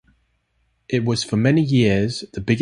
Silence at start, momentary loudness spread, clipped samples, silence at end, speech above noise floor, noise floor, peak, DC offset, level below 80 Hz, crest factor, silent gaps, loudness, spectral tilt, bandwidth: 0.9 s; 9 LU; under 0.1%; 0 s; 49 dB; -67 dBFS; -4 dBFS; under 0.1%; -46 dBFS; 16 dB; none; -20 LUFS; -6 dB/octave; 11.5 kHz